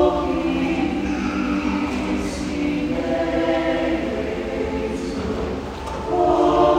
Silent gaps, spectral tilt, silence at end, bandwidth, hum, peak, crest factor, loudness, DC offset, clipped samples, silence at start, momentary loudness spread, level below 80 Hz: none; -6 dB/octave; 0 s; 13.5 kHz; none; -4 dBFS; 18 dB; -22 LUFS; under 0.1%; under 0.1%; 0 s; 7 LU; -36 dBFS